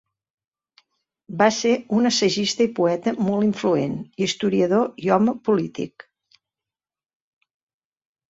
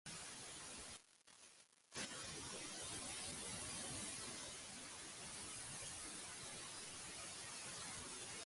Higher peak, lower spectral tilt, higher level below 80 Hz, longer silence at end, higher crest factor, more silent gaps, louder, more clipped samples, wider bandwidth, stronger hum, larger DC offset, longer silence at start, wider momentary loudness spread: first, -4 dBFS vs -36 dBFS; first, -5 dB/octave vs -1.5 dB/octave; first, -64 dBFS vs -72 dBFS; first, 2.4 s vs 0 s; about the same, 20 dB vs 16 dB; neither; first, -21 LUFS vs -49 LUFS; neither; second, 8 kHz vs 11.5 kHz; neither; neither; first, 1.3 s vs 0.05 s; about the same, 7 LU vs 8 LU